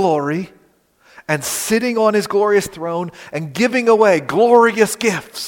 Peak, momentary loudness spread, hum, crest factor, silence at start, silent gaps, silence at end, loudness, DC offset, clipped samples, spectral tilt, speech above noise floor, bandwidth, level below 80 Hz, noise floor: 0 dBFS; 13 LU; none; 16 dB; 0 s; none; 0 s; -16 LUFS; under 0.1%; under 0.1%; -4.5 dB/octave; 39 dB; 17 kHz; -58 dBFS; -55 dBFS